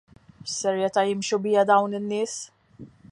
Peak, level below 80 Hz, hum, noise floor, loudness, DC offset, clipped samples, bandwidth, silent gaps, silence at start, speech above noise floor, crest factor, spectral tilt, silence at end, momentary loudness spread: -6 dBFS; -68 dBFS; none; -48 dBFS; -24 LUFS; under 0.1%; under 0.1%; 11 kHz; none; 0.45 s; 24 dB; 18 dB; -4 dB/octave; 0.05 s; 15 LU